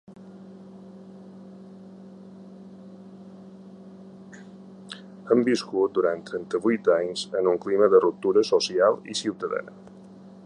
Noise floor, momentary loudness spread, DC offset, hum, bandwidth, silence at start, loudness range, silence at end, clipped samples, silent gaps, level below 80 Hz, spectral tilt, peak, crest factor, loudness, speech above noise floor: -46 dBFS; 24 LU; under 0.1%; none; 11 kHz; 0.1 s; 23 LU; 0.15 s; under 0.1%; none; -72 dBFS; -4.5 dB/octave; -4 dBFS; 22 dB; -23 LUFS; 23 dB